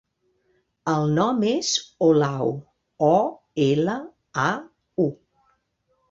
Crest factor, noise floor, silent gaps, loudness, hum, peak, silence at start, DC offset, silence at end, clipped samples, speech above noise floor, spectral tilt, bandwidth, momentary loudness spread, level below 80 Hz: 18 dB; -70 dBFS; none; -23 LUFS; none; -6 dBFS; 0.85 s; under 0.1%; 0.95 s; under 0.1%; 49 dB; -5 dB/octave; 7.8 kHz; 12 LU; -64 dBFS